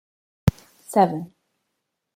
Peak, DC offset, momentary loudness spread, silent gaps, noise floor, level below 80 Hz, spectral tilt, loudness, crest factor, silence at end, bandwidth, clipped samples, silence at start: -2 dBFS; under 0.1%; 13 LU; none; -79 dBFS; -46 dBFS; -7 dB/octave; -23 LUFS; 24 dB; 0.9 s; 16.5 kHz; under 0.1%; 0.45 s